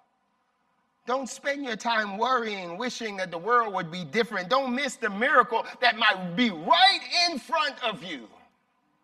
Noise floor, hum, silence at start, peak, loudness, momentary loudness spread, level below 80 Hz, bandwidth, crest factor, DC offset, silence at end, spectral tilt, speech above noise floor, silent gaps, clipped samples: -72 dBFS; none; 1.05 s; -6 dBFS; -25 LUFS; 11 LU; -76 dBFS; 14 kHz; 22 dB; under 0.1%; 0.75 s; -3 dB/octave; 46 dB; none; under 0.1%